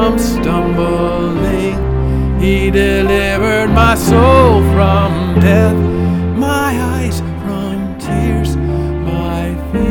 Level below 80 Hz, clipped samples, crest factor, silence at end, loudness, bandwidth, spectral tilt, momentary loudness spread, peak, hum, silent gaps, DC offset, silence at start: -20 dBFS; under 0.1%; 12 dB; 0 s; -13 LUFS; 18.5 kHz; -6.5 dB/octave; 9 LU; 0 dBFS; none; none; under 0.1%; 0 s